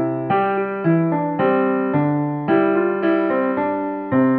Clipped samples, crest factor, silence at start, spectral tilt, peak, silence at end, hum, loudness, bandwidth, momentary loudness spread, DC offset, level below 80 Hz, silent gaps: under 0.1%; 12 dB; 0 s; -7 dB/octave; -6 dBFS; 0 s; none; -19 LUFS; 4.3 kHz; 3 LU; under 0.1%; -64 dBFS; none